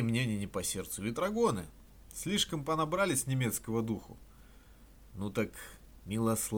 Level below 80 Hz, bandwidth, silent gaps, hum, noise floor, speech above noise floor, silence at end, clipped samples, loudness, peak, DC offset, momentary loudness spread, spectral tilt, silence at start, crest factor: -56 dBFS; over 20 kHz; none; none; -57 dBFS; 23 dB; 0 s; under 0.1%; -34 LUFS; -16 dBFS; under 0.1%; 18 LU; -4.5 dB/octave; 0 s; 18 dB